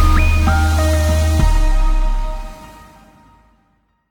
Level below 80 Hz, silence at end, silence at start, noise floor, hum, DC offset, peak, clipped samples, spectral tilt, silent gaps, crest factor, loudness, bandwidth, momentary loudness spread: -16 dBFS; 1.4 s; 0 s; -61 dBFS; none; under 0.1%; -2 dBFS; under 0.1%; -5.5 dB/octave; none; 14 dB; -17 LUFS; 17.5 kHz; 15 LU